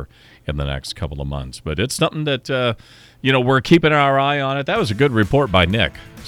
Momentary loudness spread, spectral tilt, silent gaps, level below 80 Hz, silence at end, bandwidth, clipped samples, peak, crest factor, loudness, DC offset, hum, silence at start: 13 LU; -5.5 dB/octave; none; -36 dBFS; 0 s; 16 kHz; under 0.1%; -2 dBFS; 16 dB; -18 LUFS; under 0.1%; none; 0 s